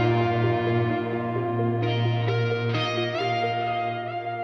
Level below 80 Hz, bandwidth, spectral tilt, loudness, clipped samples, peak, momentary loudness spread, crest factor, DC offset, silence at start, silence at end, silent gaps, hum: -60 dBFS; 6.4 kHz; -7.5 dB/octave; -25 LUFS; under 0.1%; -10 dBFS; 4 LU; 14 dB; under 0.1%; 0 s; 0 s; none; none